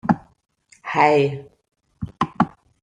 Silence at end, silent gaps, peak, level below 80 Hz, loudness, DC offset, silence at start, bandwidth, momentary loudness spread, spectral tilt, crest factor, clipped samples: 0.35 s; none; -2 dBFS; -54 dBFS; -21 LUFS; under 0.1%; 0.05 s; 10 kHz; 19 LU; -7 dB/octave; 20 dB; under 0.1%